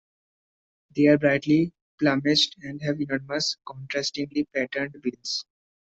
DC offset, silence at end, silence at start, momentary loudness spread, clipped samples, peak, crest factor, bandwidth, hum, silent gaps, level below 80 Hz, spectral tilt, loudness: under 0.1%; 0.4 s; 0.95 s; 11 LU; under 0.1%; -6 dBFS; 18 dB; 8 kHz; none; 1.81-1.98 s; -64 dBFS; -4.5 dB/octave; -25 LUFS